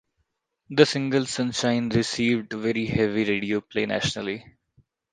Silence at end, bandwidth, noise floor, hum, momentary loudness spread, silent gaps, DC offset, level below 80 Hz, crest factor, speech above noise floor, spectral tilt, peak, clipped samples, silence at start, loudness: 0.7 s; 9.8 kHz; -75 dBFS; none; 7 LU; none; under 0.1%; -54 dBFS; 24 dB; 51 dB; -5 dB/octave; 0 dBFS; under 0.1%; 0.7 s; -24 LUFS